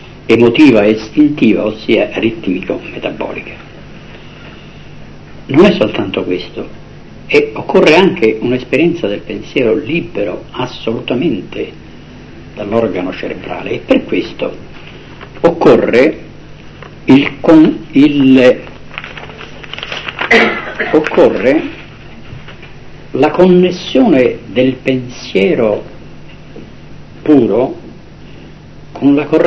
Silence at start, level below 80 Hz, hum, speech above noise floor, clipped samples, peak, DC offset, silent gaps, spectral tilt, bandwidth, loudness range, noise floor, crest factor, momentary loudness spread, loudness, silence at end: 0 s; -40 dBFS; none; 22 dB; 1%; 0 dBFS; under 0.1%; none; -7 dB/octave; 8 kHz; 7 LU; -33 dBFS; 12 dB; 24 LU; -12 LUFS; 0 s